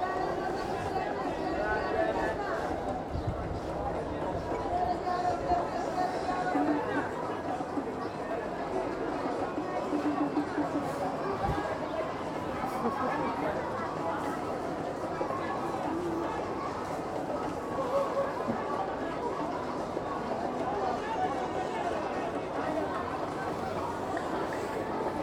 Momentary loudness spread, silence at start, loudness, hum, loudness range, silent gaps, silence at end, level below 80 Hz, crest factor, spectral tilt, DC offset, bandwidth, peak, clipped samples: 4 LU; 0 s; -33 LUFS; none; 2 LU; none; 0 s; -52 dBFS; 16 dB; -6 dB/octave; under 0.1%; 17 kHz; -16 dBFS; under 0.1%